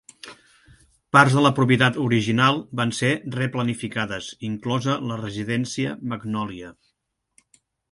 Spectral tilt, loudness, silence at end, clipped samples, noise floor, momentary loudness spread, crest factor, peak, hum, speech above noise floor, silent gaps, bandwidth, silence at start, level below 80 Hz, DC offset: -5.5 dB/octave; -22 LUFS; 1.2 s; under 0.1%; -75 dBFS; 14 LU; 22 dB; 0 dBFS; none; 53 dB; none; 11.5 kHz; 0.25 s; -58 dBFS; under 0.1%